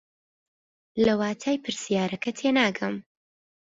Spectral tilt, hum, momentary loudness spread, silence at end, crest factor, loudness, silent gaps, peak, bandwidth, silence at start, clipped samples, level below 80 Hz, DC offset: -4.5 dB/octave; none; 9 LU; 0.7 s; 18 dB; -26 LUFS; none; -8 dBFS; 7.8 kHz; 0.95 s; under 0.1%; -62 dBFS; under 0.1%